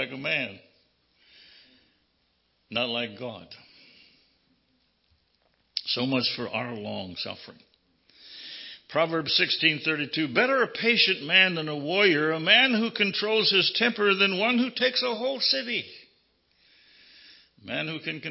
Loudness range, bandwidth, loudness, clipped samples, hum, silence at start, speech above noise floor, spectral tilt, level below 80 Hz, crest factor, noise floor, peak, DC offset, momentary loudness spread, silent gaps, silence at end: 14 LU; 6 kHz; -24 LUFS; under 0.1%; none; 0 s; 45 dB; -7 dB/octave; -72 dBFS; 24 dB; -71 dBFS; -4 dBFS; under 0.1%; 16 LU; none; 0 s